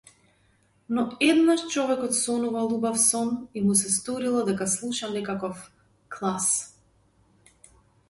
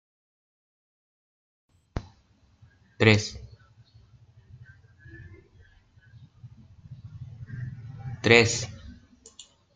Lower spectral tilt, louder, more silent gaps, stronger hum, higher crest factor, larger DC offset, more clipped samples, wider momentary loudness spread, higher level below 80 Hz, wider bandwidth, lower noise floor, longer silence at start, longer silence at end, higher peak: about the same, -3.5 dB/octave vs -4.5 dB/octave; about the same, -25 LUFS vs -23 LUFS; neither; neither; second, 18 dB vs 30 dB; neither; neither; second, 10 LU vs 30 LU; second, -66 dBFS vs -54 dBFS; first, 12 kHz vs 9.4 kHz; about the same, -64 dBFS vs -62 dBFS; second, 0.9 s vs 1.95 s; first, 1.4 s vs 0.35 s; second, -8 dBFS vs -2 dBFS